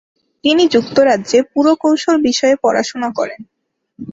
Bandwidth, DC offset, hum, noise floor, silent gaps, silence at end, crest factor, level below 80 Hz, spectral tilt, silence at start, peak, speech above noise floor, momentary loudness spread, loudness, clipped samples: 7.8 kHz; under 0.1%; none; -39 dBFS; none; 0 s; 14 dB; -56 dBFS; -3.5 dB/octave; 0.45 s; -2 dBFS; 26 dB; 8 LU; -14 LUFS; under 0.1%